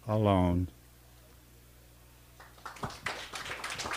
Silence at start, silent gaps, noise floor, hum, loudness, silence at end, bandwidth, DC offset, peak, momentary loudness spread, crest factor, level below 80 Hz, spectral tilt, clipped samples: 0.05 s; none; -57 dBFS; 60 Hz at -60 dBFS; -33 LUFS; 0 s; 15.5 kHz; under 0.1%; -12 dBFS; 21 LU; 22 dB; -54 dBFS; -6 dB/octave; under 0.1%